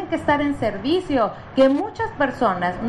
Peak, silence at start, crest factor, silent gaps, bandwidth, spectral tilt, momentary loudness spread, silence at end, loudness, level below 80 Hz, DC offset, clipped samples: -4 dBFS; 0 s; 16 dB; none; 11 kHz; -6.5 dB/octave; 5 LU; 0 s; -21 LUFS; -46 dBFS; under 0.1%; under 0.1%